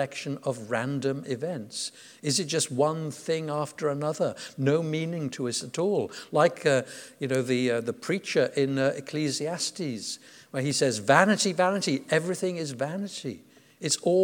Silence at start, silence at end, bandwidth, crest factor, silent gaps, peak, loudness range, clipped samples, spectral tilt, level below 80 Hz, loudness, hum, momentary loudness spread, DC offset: 0 s; 0 s; 19 kHz; 24 dB; none; -4 dBFS; 3 LU; under 0.1%; -4 dB/octave; -78 dBFS; -28 LUFS; none; 11 LU; under 0.1%